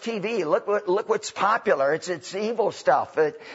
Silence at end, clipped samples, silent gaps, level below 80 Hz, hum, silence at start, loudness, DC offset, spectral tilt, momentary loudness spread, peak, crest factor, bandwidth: 0 s; under 0.1%; none; -76 dBFS; none; 0 s; -24 LUFS; under 0.1%; -4 dB/octave; 6 LU; -8 dBFS; 16 dB; 8 kHz